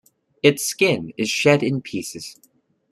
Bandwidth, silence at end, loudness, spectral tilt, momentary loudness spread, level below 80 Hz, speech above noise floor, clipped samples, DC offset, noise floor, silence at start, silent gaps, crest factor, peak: 14.5 kHz; 0.6 s; -20 LUFS; -4 dB/octave; 15 LU; -62 dBFS; 41 dB; under 0.1%; under 0.1%; -61 dBFS; 0.45 s; none; 20 dB; -2 dBFS